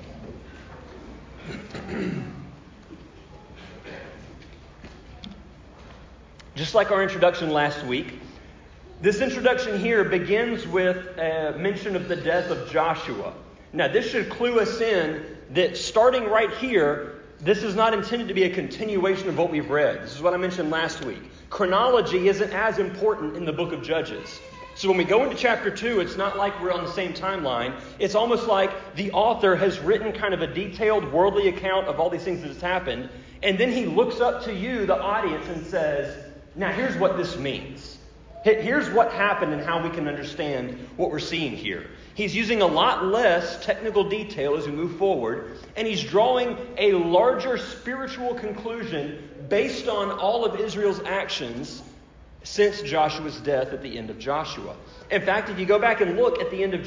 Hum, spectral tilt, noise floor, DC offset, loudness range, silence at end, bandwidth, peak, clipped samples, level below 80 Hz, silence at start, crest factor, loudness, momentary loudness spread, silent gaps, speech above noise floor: none; -5 dB/octave; -48 dBFS; under 0.1%; 4 LU; 0 s; 7.6 kHz; -6 dBFS; under 0.1%; -50 dBFS; 0 s; 18 dB; -24 LUFS; 16 LU; none; 24 dB